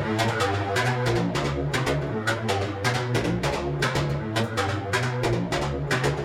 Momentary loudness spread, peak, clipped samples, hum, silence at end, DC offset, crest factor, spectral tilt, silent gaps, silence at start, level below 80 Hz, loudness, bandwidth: 3 LU; -10 dBFS; under 0.1%; none; 0 s; under 0.1%; 16 dB; -5 dB/octave; none; 0 s; -42 dBFS; -25 LUFS; 16 kHz